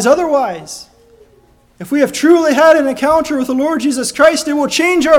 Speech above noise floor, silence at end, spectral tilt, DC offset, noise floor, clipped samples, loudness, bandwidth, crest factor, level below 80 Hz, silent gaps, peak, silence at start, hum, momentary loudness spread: 37 dB; 0 s; -3.5 dB/octave; under 0.1%; -49 dBFS; 0.2%; -12 LUFS; 18 kHz; 12 dB; -48 dBFS; none; 0 dBFS; 0 s; none; 12 LU